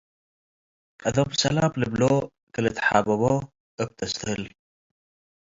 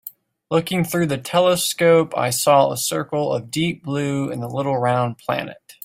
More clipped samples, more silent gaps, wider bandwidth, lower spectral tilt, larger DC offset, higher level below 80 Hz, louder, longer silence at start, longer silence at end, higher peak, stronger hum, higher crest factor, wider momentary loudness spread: neither; first, 2.43-2.47 s, 3.60-3.78 s vs none; second, 7.8 kHz vs 16 kHz; about the same, -5 dB/octave vs -4.5 dB/octave; neither; first, -52 dBFS vs -58 dBFS; second, -25 LUFS vs -20 LUFS; first, 1 s vs 0.05 s; first, 1.1 s vs 0.15 s; about the same, -4 dBFS vs -2 dBFS; neither; about the same, 22 dB vs 18 dB; about the same, 11 LU vs 9 LU